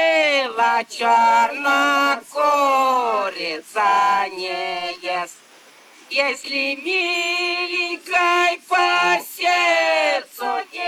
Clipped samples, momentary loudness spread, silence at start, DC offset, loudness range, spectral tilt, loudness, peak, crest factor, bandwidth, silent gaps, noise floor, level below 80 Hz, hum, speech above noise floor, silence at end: under 0.1%; 9 LU; 0 s; under 0.1%; 5 LU; -1 dB/octave; -19 LUFS; -2 dBFS; 16 dB; 17 kHz; none; -48 dBFS; -76 dBFS; none; 29 dB; 0 s